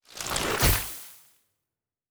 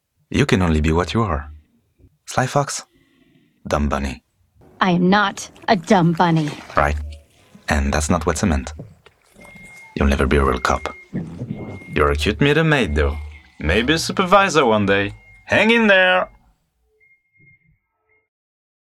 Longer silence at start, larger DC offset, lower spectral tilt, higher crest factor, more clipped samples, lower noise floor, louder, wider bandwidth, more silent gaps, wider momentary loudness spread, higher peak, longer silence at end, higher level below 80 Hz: second, 0.1 s vs 0.3 s; neither; second, -3 dB/octave vs -5 dB/octave; first, 22 dB vs 16 dB; neither; first, -88 dBFS vs -65 dBFS; second, -26 LUFS vs -18 LUFS; first, over 20 kHz vs 14 kHz; neither; about the same, 17 LU vs 16 LU; second, -10 dBFS vs -2 dBFS; second, 0.95 s vs 2.65 s; second, -38 dBFS vs -32 dBFS